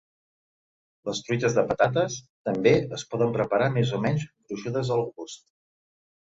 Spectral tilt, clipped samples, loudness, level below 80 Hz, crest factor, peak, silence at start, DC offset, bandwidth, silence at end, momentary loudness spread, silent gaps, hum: -6 dB/octave; under 0.1%; -26 LUFS; -60 dBFS; 20 dB; -6 dBFS; 1.05 s; under 0.1%; 8 kHz; 0.85 s; 14 LU; 2.29-2.45 s; none